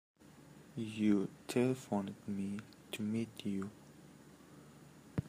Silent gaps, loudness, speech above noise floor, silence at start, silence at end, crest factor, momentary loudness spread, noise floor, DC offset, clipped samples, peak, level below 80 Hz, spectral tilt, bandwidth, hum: none; -39 LUFS; 22 dB; 0.2 s; 0 s; 20 dB; 25 LU; -59 dBFS; under 0.1%; under 0.1%; -20 dBFS; -72 dBFS; -6.5 dB/octave; 15.5 kHz; none